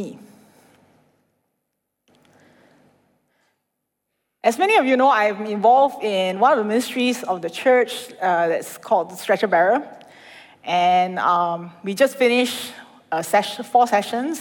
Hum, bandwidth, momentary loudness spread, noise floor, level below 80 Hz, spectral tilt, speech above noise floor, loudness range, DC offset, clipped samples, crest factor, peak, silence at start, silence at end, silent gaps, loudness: none; 19 kHz; 10 LU; -78 dBFS; -76 dBFS; -4 dB/octave; 59 dB; 3 LU; under 0.1%; under 0.1%; 18 dB; -4 dBFS; 0 s; 0 s; none; -19 LUFS